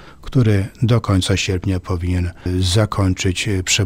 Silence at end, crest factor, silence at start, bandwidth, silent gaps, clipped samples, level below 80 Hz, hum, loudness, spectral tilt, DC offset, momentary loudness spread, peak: 0 s; 14 dB; 0 s; 15.5 kHz; none; under 0.1%; -36 dBFS; none; -18 LUFS; -5 dB/octave; under 0.1%; 5 LU; -2 dBFS